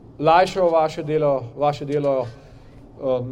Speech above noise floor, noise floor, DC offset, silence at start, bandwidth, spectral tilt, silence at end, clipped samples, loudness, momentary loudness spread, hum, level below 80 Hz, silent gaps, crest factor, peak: 24 dB; -44 dBFS; under 0.1%; 0.05 s; 11.5 kHz; -6.5 dB/octave; 0 s; under 0.1%; -20 LUFS; 9 LU; none; -50 dBFS; none; 18 dB; -4 dBFS